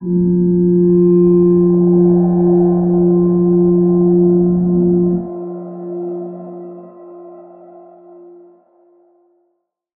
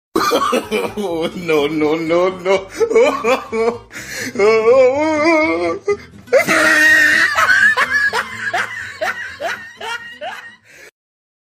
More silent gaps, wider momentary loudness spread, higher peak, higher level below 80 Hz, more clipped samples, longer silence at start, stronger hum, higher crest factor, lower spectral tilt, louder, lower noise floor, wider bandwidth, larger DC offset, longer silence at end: neither; about the same, 16 LU vs 15 LU; about the same, -2 dBFS vs -2 dBFS; first, -44 dBFS vs -52 dBFS; neither; second, 0 s vs 0.15 s; neither; about the same, 12 dB vs 14 dB; first, -16 dB/octave vs -3 dB/octave; about the same, -13 LUFS vs -14 LUFS; first, -68 dBFS vs -40 dBFS; second, 1.7 kHz vs 15.5 kHz; neither; first, 2.55 s vs 0.6 s